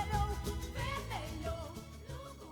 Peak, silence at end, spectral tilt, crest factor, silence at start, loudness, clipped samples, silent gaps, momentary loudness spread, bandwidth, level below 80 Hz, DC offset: -22 dBFS; 0 s; -5 dB/octave; 18 dB; 0 s; -41 LUFS; under 0.1%; none; 12 LU; over 20 kHz; -44 dBFS; under 0.1%